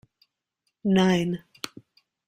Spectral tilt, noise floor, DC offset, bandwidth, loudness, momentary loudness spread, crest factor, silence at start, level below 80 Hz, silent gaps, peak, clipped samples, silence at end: -6 dB/octave; -79 dBFS; under 0.1%; 14.5 kHz; -24 LUFS; 18 LU; 20 dB; 0.85 s; -62 dBFS; none; -8 dBFS; under 0.1%; 0.9 s